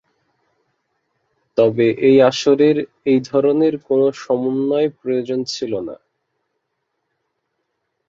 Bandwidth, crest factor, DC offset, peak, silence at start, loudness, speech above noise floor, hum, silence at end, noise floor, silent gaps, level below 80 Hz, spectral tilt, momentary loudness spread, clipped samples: 7.6 kHz; 16 dB; under 0.1%; -2 dBFS; 1.55 s; -17 LUFS; 58 dB; none; 2.15 s; -74 dBFS; none; -64 dBFS; -6 dB/octave; 10 LU; under 0.1%